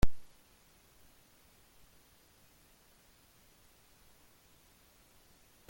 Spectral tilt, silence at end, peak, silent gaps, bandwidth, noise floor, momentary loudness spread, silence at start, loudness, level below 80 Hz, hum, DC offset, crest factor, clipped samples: -5.5 dB/octave; 5.5 s; -12 dBFS; none; 17 kHz; -65 dBFS; 0 LU; 0.05 s; -56 LUFS; -48 dBFS; none; under 0.1%; 24 dB; under 0.1%